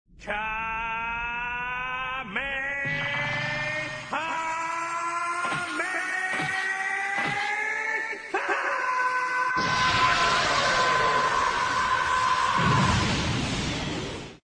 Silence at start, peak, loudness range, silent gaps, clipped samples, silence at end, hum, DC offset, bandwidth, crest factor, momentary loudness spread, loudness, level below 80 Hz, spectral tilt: 0.2 s; -10 dBFS; 6 LU; none; under 0.1%; 0.1 s; none; under 0.1%; 10.5 kHz; 16 dB; 8 LU; -26 LUFS; -46 dBFS; -3.5 dB/octave